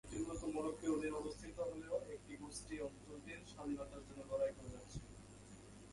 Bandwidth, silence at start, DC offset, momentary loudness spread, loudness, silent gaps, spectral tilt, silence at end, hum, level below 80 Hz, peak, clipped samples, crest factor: 11.5 kHz; 0.05 s; under 0.1%; 15 LU; -46 LUFS; none; -5.5 dB/octave; 0 s; 50 Hz at -60 dBFS; -62 dBFS; -28 dBFS; under 0.1%; 18 dB